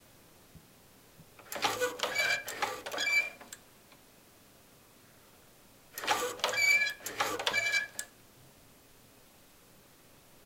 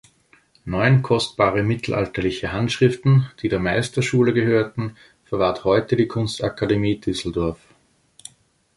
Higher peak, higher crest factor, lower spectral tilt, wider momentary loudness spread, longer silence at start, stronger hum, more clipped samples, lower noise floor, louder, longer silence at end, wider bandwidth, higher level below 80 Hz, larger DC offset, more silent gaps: second, -12 dBFS vs -2 dBFS; first, 24 dB vs 18 dB; second, -0.5 dB/octave vs -6.5 dB/octave; first, 18 LU vs 8 LU; about the same, 0.55 s vs 0.65 s; neither; neither; about the same, -59 dBFS vs -59 dBFS; second, -30 LUFS vs -21 LUFS; first, 2.35 s vs 1.2 s; first, 16.5 kHz vs 11.5 kHz; second, -70 dBFS vs -44 dBFS; neither; neither